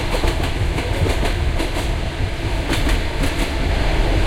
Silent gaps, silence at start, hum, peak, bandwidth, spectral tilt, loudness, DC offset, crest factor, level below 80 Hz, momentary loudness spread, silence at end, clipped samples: none; 0 s; none; -4 dBFS; 16 kHz; -5 dB/octave; -21 LUFS; under 0.1%; 14 dB; -22 dBFS; 4 LU; 0 s; under 0.1%